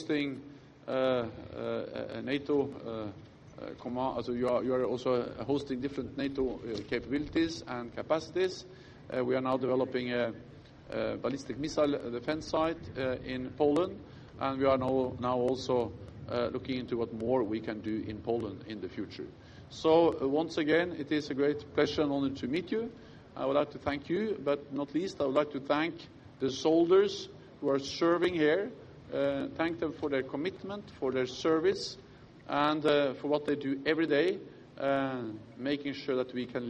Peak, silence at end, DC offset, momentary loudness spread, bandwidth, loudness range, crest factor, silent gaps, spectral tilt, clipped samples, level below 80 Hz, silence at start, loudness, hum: -12 dBFS; 0 s; under 0.1%; 13 LU; 10.5 kHz; 5 LU; 20 dB; none; -6 dB/octave; under 0.1%; -62 dBFS; 0 s; -32 LUFS; none